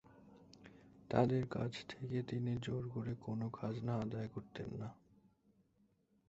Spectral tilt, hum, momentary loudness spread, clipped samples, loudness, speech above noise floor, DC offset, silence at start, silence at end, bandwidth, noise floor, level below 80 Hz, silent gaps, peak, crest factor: -7 dB/octave; none; 20 LU; under 0.1%; -41 LUFS; 36 dB; under 0.1%; 0.1 s; 1.35 s; 8 kHz; -76 dBFS; -68 dBFS; none; -16 dBFS; 26 dB